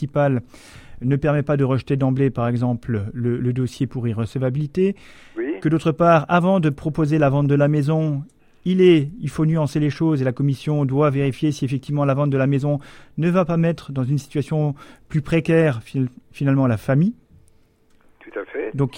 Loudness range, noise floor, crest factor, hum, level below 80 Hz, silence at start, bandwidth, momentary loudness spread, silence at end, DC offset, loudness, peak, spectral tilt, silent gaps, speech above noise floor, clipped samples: 4 LU; -55 dBFS; 16 dB; none; -48 dBFS; 0 s; 10.5 kHz; 10 LU; 0 s; under 0.1%; -20 LUFS; -2 dBFS; -8.5 dB/octave; none; 36 dB; under 0.1%